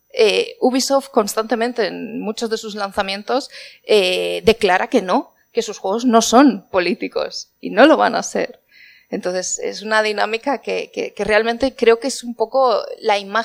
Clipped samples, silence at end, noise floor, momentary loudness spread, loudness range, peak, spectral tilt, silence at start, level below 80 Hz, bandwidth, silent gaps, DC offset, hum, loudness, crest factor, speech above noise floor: under 0.1%; 0 s; -48 dBFS; 11 LU; 4 LU; 0 dBFS; -3 dB/octave; 0.15 s; -52 dBFS; 16 kHz; none; under 0.1%; none; -18 LUFS; 18 dB; 31 dB